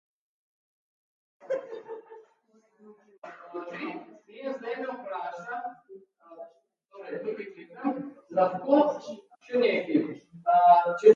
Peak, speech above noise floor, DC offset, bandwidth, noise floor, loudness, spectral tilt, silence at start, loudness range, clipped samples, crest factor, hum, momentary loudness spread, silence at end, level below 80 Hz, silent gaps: -6 dBFS; 40 dB; under 0.1%; 7.2 kHz; -66 dBFS; -27 LUFS; -6.5 dB/octave; 1.45 s; 15 LU; under 0.1%; 24 dB; none; 24 LU; 0 s; -84 dBFS; 3.18-3.22 s